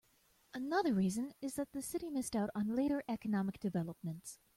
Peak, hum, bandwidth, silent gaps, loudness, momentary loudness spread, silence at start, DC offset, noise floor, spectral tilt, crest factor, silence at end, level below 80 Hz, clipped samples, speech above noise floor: -22 dBFS; none; 16 kHz; none; -38 LUFS; 11 LU; 0.55 s; under 0.1%; -72 dBFS; -6 dB/octave; 16 dB; 0.2 s; -68 dBFS; under 0.1%; 34 dB